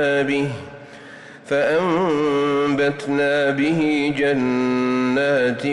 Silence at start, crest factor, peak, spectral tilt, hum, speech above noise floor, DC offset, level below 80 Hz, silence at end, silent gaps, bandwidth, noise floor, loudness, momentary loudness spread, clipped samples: 0 s; 10 dB; -10 dBFS; -6 dB/octave; none; 21 dB; under 0.1%; -58 dBFS; 0 s; none; 11 kHz; -40 dBFS; -19 LUFS; 18 LU; under 0.1%